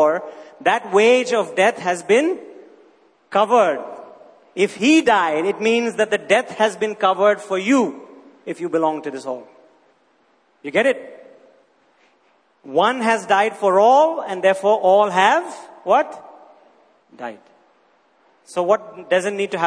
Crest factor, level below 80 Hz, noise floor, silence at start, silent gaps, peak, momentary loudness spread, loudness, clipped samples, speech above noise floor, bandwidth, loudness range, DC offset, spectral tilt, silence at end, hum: 18 dB; -72 dBFS; -60 dBFS; 0 s; none; -2 dBFS; 18 LU; -18 LUFS; under 0.1%; 42 dB; 10.5 kHz; 9 LU; under 0.1%; -4 dB/octave; 0 s; none